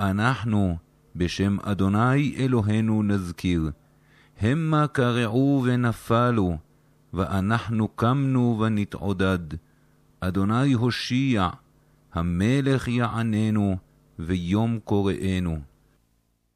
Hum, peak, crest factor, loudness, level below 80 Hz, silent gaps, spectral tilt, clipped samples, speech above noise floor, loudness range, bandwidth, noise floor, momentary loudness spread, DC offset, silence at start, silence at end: none; -10 dBFS; 14 dB; -24 LUFS; -46 dBFS; none; -7.5 dB/octave; under 0.1%; 45 dB; 2 LU; 13.5 kHz; -68 dBFS; 8 LU; under 0.1%; 0 s; 0.9 s